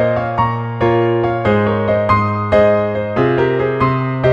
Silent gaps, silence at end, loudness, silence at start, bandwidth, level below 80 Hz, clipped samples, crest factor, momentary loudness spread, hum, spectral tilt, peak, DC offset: none; 0 s; -15 LUFS; 0 s; 7 kHz; -38 dBFS; under 0.1%; 14 dB; 4 LU; none; -9 dB/octave; -2 dBFS; under 0.1%